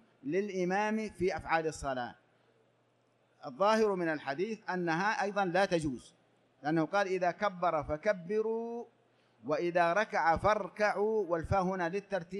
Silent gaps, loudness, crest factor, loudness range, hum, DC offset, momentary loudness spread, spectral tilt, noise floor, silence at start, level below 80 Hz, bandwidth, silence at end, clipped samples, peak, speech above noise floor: none; -32 LUFS; 18 dB; 3 LU; none; under 0.1%; 10 LU; -5.5 dB/octave; -72 dBFS; 0.25 s; -58 dBFS; 12 kHz; 0 s; under 0.1%; -14 dBFS; 39 dB